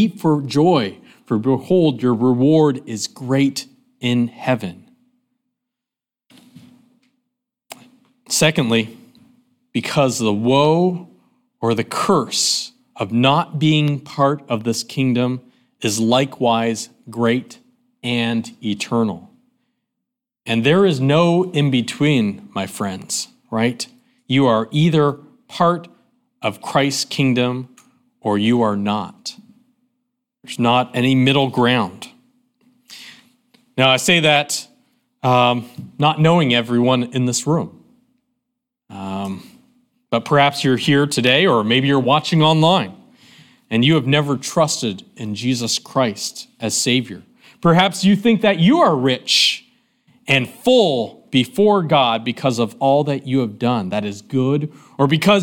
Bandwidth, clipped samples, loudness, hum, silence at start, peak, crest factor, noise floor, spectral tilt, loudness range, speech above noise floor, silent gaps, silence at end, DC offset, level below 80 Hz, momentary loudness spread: 17 kHz; under 0.1%; -17 LUFS; none; 0 s; 0 dBFS; 18 dB; -87 dBFS; -5 dB/octave; 7 LU; 70 dB; none; 0 s; under 0.1%; -60 dBFS; 13 LU